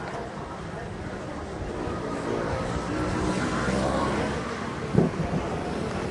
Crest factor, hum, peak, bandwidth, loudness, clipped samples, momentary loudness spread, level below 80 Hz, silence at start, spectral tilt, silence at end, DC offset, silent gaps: 22 dB; none; -6 dBFS; 11.5 kHz; -29 LUFS; under 0.1%; 10 LU; -42 dBFS; 0 s; -6 dB/octave; 0 s; under 0.1%; none